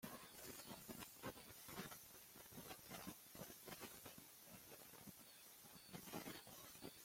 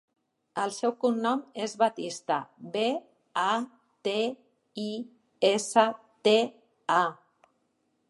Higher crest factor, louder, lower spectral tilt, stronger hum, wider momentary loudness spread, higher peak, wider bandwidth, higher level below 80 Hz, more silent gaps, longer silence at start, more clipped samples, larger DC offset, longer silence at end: about the same, 20 dB vs 22 dB; second, -57 LUFS vs -29 LUFS; about the same, -3 dB/octave vs -3.5 dB/octave; neither; second, 6 LU vs 13 LU; second, -38 dBFS vs -8 dBFS; first, 16.5 kHz vs 11.5 kHz; about the same, -80 dBFS vs -84 dBFS; neither; second, 0 s vs 0.55 s; neither; neither; second, 0 s vs 0.95 s